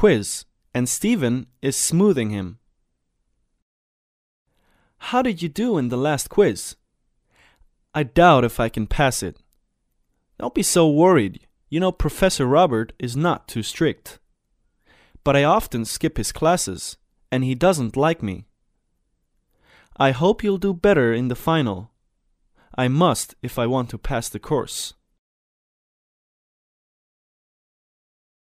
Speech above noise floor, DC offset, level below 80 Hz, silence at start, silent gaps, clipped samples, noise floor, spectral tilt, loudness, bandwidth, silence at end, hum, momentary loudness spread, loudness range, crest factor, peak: 52 dB; under 0.1%; -42 dBFS; 0 s; 3.62-4.45 s; under 0.1%; -71 dBFS; -5 dB/octave; -21 LUFS; 15.5 kHz; 3.65 s; none; 13 LU; 8 LU; 20 dB; -2 dBFS